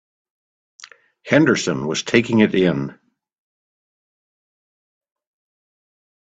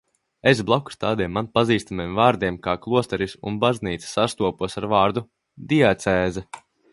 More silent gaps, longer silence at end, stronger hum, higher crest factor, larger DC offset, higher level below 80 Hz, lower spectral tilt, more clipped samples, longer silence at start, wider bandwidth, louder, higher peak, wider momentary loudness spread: neither; first, 3.4 s vs 0.35 s; neither; about the same, 22 dB vs 20 dB; neither; second, -58 dBFS vs -48 dBFS; about the same, -5 dB/octave vs -5.5 dB/octave; neither; first, 0.8 s vs 0.45 s; second, 8.4 kHz vs 11.5 kHz; first, -18 LUFS vs -22 LUFS; about the same, 0 dBFS vs -2 dBFS; about the same, 8 LU vs 9 LU